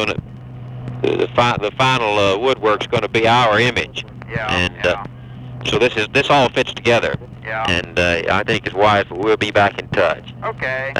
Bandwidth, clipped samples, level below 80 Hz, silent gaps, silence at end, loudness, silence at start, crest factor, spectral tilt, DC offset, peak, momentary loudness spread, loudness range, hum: 12.5 kHz; under 0.1%; -42 dBFS; none; 0 s; -17 LUFS; 0 s; 16 dB; -5 dB/octave; under 0.1%; -2 dBFS; 13 LU; 2 LU; none